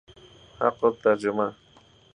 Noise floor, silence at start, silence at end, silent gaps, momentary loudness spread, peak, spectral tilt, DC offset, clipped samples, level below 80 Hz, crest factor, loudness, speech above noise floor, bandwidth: -51 dBFS; 0.6 s; 0.6 s; none; 6 LU; -6 dBFS; -6.5 dB/octave; under 0.1%; under 0.1%; -64 dBFS; 22 dB; -25 LUFS; 28 dB; 10 kHz